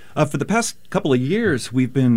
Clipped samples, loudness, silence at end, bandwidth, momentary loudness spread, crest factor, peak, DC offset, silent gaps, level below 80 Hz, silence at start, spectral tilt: under 0.1%; -20 LUFS; 0 s; 16 kHz; 4 LU; 16 dB; -2 dBFS; 1%; none; -52 dBFS; 0.15 s; -6 dB/octave